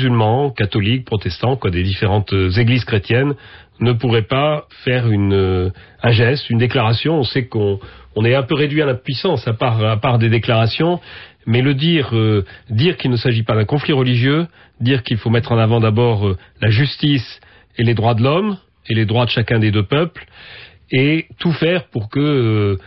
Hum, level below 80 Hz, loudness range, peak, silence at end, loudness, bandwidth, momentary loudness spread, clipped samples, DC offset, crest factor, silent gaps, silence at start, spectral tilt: none; -38 dBFS; 1 LU; -4 dBFS; 0.05 s; -16 LUFS; 5.8 kHz; 7 LU; under 0.1%; 0.1%; 12 dB; none; 0 s; -10 dB/octave